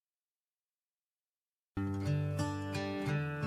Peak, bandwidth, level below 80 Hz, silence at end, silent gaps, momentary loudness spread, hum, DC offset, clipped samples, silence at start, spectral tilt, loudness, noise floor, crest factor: -22 dBFS; 13.5 kHz; -64 dBFS; 0 s; none; 5 LU; none; under 0.1%; under 0.1%; 1.75 s; -7 dB/octave; -37 LUFS; under -90 dBFS; 16 dB